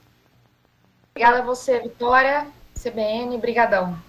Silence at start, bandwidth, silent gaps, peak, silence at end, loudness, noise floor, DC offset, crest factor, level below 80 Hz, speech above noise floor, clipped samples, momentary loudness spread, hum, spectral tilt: 1.15 s; 15 kHz; none; -4 dBFS; 0.05 s; -20 LUFS; -61 dBFS; under 0.1%; 18 dB; -48 dBFS; 40 dB; under 0.1%; 14 LU; none; -4.5 dB/octave